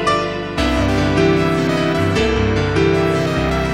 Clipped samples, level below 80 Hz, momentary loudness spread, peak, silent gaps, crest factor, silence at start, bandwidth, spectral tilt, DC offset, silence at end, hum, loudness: under 0.1%; -28 dBFS; 3 LU; -2 dBFS; none; 14 dB; 0 s; 15.5 kHz; -6 dB/octave; 0.7%; 0 s; none; -16 LUFS